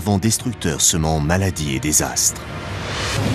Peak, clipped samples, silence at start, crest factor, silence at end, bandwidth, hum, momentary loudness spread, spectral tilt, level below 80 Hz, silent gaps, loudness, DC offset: -2 dBFS; under 0.1%; 0 s; 18 dB; 0 s; 15.5 kHz; none; 11 LU; -3.5 dB/octave; -34 dBFS; none; -18 LUFS; under 0.1%